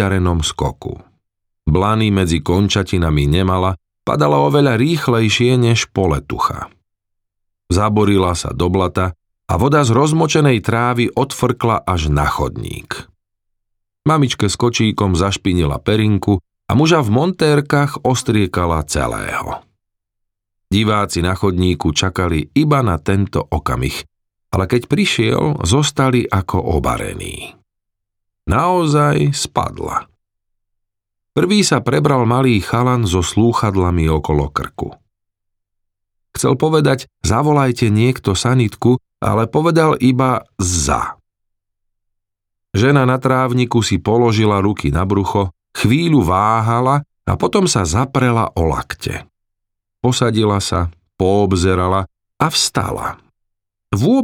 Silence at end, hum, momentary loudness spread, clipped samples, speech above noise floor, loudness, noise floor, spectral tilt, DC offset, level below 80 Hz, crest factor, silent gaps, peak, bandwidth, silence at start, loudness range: 0 s; none; 9 LU; under 0.1%; 62 dB; -16 LUFS; -77 dBFS; -5.5 dB/octave; under 0.1%; -36 dBFS; 14 dB; none; -2 dBFS; 16.5 kHz; 0 s; 4 LU